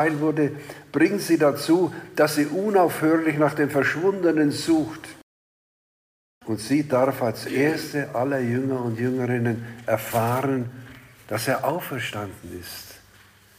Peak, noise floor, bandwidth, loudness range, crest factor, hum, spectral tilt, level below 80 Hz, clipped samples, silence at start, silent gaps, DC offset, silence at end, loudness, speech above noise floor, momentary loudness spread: -8 dBFS; -53 dBFS; 15.5 kHz; 5 LU; 16 dB; none; -6 dB/octave; -62 dBFS; under 0.1%; 0 s; 5.23-6.41 s; under 0.1%; 0.6 s; -23 LUFS; 30 dB; 15 LU